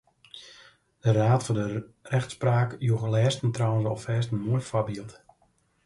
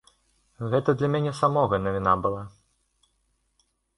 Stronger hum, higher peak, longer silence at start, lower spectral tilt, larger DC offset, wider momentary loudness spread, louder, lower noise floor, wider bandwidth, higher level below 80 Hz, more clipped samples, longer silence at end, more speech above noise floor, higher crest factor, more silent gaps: neither; about the same, -10 dBFS vs -8 dBFS; second, 0.35 s vs 0.6 s; about the same, -6.5 dB/octave vs -7.5 dB/octave; neither; first, 17 LU vs 13 LU; about the same, -27 LUFS vs -25 LUFS; second, -67 dBFS vs -72 dBFS; about the same, 11.5 kHz vs 11 kHz; second, -58 dBFS vs -52 dBFS; neither; second, 0.75 s vs 1.5 s; second, 42 dB vs 47 dB; about the same, 18 dB vs 20 dB; neither